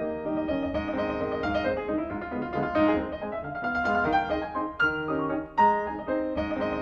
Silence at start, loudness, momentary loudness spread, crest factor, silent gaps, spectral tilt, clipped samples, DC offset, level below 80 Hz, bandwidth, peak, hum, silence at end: 0 s; -28 LUFS; 8 LU; 16 dB; none; -7.5 dB/octave; under 0.1%; under 0.1%; -48 dBFS; 7 kHz; -10 dBFS; none; 0 s